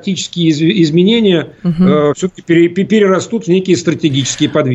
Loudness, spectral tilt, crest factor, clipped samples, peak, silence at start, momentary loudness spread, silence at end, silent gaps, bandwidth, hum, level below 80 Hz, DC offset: -12 LUFS; -5.5 dB/octave; 12 dB; under 0.1%; 0 dBFS; 0.05 s; 5 LU; 0 s; none; 8.2 kHz; none; -48 dBFS; under 0.1%